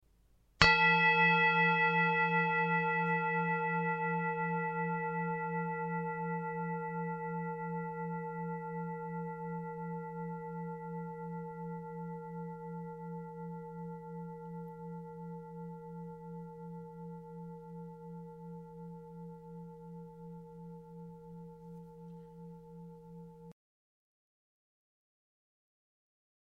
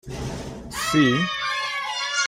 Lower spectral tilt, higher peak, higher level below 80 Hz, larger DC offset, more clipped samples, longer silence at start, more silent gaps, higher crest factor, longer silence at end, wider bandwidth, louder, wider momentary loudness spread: first, -6 dB/octave vs -3.5 dB/octave; about the same, -6 dBFS vs -6 dBFS; second, -62 dBFS vs -46 dBFS; neither; neither; first, 0.6 s vs 0.05 s; neither; first, 30 dB vs 18 dB; first, 3 s vs 0 s; second, 8 kHz vs 16 kHz; second, -33 LUFS vs -23 LUFS; first, 23 LU vs 14 LU